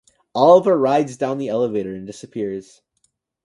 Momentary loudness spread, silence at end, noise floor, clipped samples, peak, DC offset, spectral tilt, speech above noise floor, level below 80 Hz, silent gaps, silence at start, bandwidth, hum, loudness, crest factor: 18 LU; 0.85 s; -68 dBFS; under 0.1%; 0 dBFS; under 0.1%; -6.5 dB/octave; 50 dB; -62 dBFS; none; 0.35 s; 11 kHz; none; -18 LUFS; 18 dB